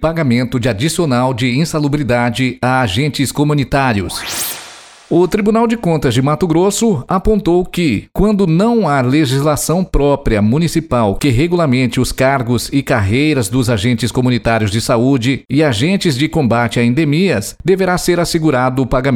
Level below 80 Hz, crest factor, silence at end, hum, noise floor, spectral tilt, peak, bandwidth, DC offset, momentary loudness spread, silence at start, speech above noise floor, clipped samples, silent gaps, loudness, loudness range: -30 dBFS; 12 dB; 0 s; none; -35 dBFS; -5.5 dB/octave; -2 dBFS; 17.5 kHz; under 0.1%; 3 LU; 0 s; 22 dB; under 0.1%; none; -14 LUFS; 2 LU